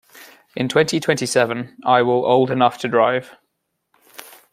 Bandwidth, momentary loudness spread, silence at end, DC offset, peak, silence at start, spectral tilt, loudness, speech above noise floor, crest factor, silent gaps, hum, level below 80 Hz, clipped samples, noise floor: 16 kHz; 10 LU; 1.25 s; under 0.1%; -2 dBFS; 0.2 s; -4.5 dB/octave; -18 LUFS; 56 dB; 18 dB; none; none; -64 dBFS; under 0.1%; -74 dBFS